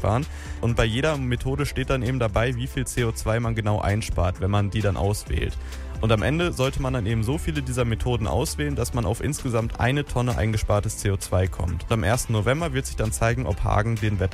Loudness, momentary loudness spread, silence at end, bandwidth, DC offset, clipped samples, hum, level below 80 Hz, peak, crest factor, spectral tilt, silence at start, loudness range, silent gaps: -25 LUFS; 4 LU; 0 s; 15.5 kHz; under 0.1%; under 0.1%; none; -32 dBFS; -6 dBFS; 16 dB; -5.5 dB/octave; 0 s; 1 LU; none